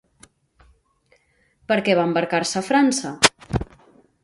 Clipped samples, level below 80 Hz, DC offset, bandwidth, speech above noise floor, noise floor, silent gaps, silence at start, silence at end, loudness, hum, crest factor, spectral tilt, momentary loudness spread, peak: under 0.1%; -44 dBFS; under 0.1%; 11.5 kHz; 43 dB; -62 dBFS; none; 1.7 s; 0.6 s; -20 LUFS; none; 24 dB; -3.5 dB/octave; 10 LU; 0 dBFS